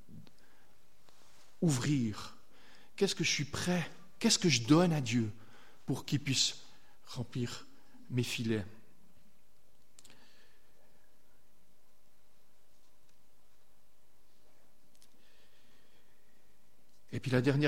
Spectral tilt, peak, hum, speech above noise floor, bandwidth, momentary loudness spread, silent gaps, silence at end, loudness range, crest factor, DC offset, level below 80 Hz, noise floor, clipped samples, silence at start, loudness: -4.5 dB/octave; -14 dBFS; none; 40 dB; 16.5 kHz; 19 LU; none; 0 s; 10 LU; 24 dB; 0.5%; -66 dBFS; -72 dBFS; under 0.1%; 0.1 s; -33 LUFS